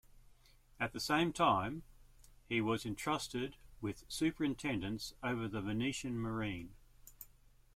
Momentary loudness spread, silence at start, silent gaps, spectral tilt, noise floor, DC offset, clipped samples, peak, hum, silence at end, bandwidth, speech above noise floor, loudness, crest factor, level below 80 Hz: 15 LU; 0.15 s; none; -5 dB/octave; -64 dBFS; under 0.1%; under 0.1%; -18 dBFS; none; 0.5 s; 16.5 kHz; 27 dB; -38 LUFS; 20 dB; -60 dBFS